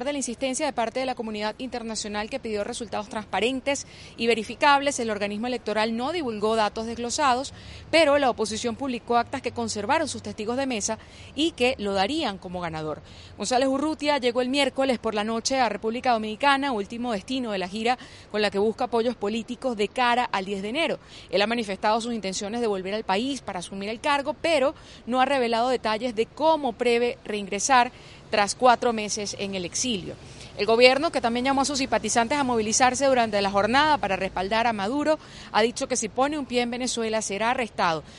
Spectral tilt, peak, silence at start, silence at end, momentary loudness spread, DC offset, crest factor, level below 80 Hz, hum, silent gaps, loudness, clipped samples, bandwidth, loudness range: -3 dB/octave; -2 dBFS; 0 s; 0 s; 10 LU; under 0.1%; 24 dB; -54 dBFS; none; none; -25 LUFS; under 0.1%; 11.5 kHz; 5 LU